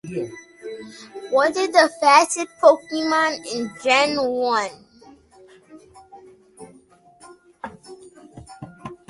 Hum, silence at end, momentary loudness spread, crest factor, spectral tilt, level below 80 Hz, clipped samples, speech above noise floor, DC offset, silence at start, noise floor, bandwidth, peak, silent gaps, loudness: none; 0.15 s; 23 LU; 22 dB; -2.5 dB/octave; -64 dBFS; under 0.1%; 33 dB; under 0.1%; 0.05 s; -52 dBFS; 11.5 kHz; 0 dBFS; none; -19 LUFS